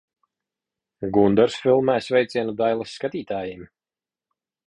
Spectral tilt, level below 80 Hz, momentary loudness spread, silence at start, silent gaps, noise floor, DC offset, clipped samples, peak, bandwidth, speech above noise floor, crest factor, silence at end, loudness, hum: -6.5 dB/octave; -56 dBFS; 12 LU; 1 s; none; under -90 dBFS; under 0.1%; under 0.1%; -4 dBFS; 10.5 kHz; over 69 dB; 20 dB; 1.05 s; -21 LUFS; none